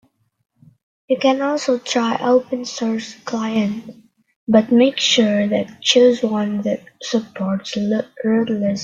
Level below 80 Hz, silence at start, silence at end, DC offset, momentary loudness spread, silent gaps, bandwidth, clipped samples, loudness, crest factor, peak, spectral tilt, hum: -62 dBFS; 1.1 s; 0 s; under 0.1%; 11 LU; 4.36-4.47 s; 7.8 kHz; under 0.1%; -18 LUFS; 16 dB; -2 dBFS; -4.5 dB/octave; none